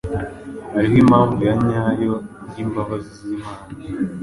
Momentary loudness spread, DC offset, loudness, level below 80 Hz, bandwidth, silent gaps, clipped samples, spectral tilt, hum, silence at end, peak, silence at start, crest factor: 18 LU; under 0.1%; -19 LUFS; -42 dBFS; 11.5 kHz; none; under 0.1%; -8.5 dB/octave; none; 0 s; -2 dBFS; 0.05 s; 18 dB